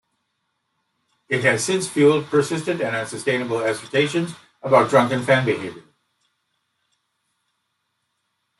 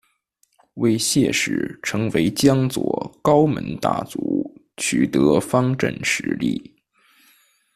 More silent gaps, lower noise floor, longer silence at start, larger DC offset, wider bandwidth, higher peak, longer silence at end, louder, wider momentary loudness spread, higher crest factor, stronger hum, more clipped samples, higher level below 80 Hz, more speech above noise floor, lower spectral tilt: neither; first, -74 dBFS vs -66 dBFS; first, 1.3 s vs 0.75 s; neither; second, 12 kHz vs 14.5 kHz; about the same, -2 dBFS vs -2 dBFS; first, 2.8 s vs 1.15 s; about the same, -20 LUFS vs -20 LUFS; about the same, 9 LU vs 8 LU; about the same, 20 dB vs 18 dB; neither; neither; second, -66 dBFS vs -52 dBFS; first, 54 dB vs 46 dB; about the same, -5 dB/octave vs -5 dB/octave